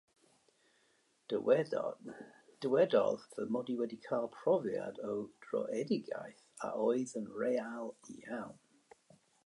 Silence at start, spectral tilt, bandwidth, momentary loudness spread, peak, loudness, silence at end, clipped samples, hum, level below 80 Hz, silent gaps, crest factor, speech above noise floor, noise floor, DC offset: 1.3 s; -6 dB/octave; 11.5 kHz; 15 LU; -16 dBFS; -36 LUFS; 0.9 s; under 0.1%; none; -84 dBFS; none; 20 dB; 38 dB; -74 dBFS; under 0.1%